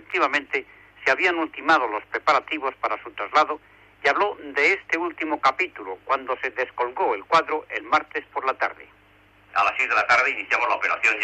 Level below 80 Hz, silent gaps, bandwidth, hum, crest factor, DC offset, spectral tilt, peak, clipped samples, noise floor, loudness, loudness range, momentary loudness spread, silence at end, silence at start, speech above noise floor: -64 dBFS; none; 9.4 kHz; none; 16 dB; under 0.1%; -2.5 dB/octave; -8 dBFS; under 0.1%; -55 dBFS; -23 LUFS; 2 LU; 8 LU; 0 s; 0.1 s; 32 dB